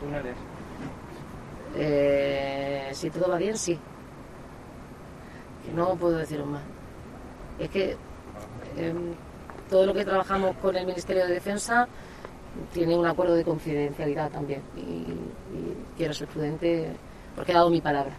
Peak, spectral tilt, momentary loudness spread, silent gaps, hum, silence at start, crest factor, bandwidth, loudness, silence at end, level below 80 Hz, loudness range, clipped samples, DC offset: -8 dBFS; -5.5 dB/octave; 20 LU; none; none; 0 s; 20 dB; 13.5 kHz; -28 LUFS; 0 s; -50 dBFS; 6 LU; under 0.1%; under 0.1%